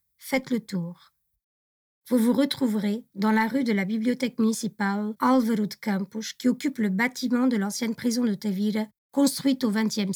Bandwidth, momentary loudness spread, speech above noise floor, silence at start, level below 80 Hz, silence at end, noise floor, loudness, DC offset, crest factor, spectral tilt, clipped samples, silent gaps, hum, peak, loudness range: 20 kHz; 6 LU; over 65 dB; 0.2 s; -72 dBFS; 0 s; under -90 dBFS; -26 LUFS; under 0.1%; 14 dB; -5 dB/octave; under 0.1%; 1.44-2.02 s, 8.98-9.10 s; none; -10 dBFS; 2 LU